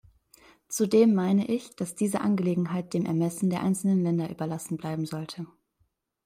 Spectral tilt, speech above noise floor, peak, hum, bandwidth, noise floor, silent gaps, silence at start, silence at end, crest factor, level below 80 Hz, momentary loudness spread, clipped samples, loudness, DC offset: -6.5 dB/octave; 47 dB; -10 dBFS; none; 16 kHz; -73 dBFS; none; 0.7 s; 0.8 s; 18 dB; -68 dBFS; 14 LU; under 0.1%; -27 LUFS; under 0.1%